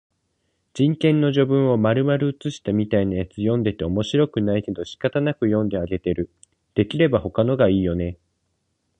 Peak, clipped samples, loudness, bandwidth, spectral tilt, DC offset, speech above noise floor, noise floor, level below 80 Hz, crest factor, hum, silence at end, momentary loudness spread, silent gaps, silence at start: -4 dBFS; under 0.1%; -21 LUFS; 9.6 kHz; -8 dB/octave; under 0.1%; 52 dB; -72 dBFS; -44 dBFS; 18 dB; none; 0.85 s; 8 LU; none; 0.75 s